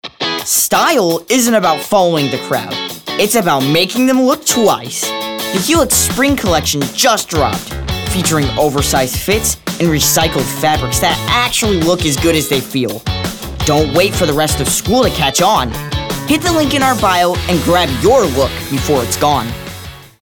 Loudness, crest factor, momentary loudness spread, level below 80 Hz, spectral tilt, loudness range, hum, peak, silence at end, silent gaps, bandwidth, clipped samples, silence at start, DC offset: -13 LUFS; 12 dB; 8 LU; -32 dBFS; -3.5 dB/octave; 1 LU; none; 0 dBFS; 0.15 s; none; over 20 kHz; under 0.1%; 0.05 s; 0.2%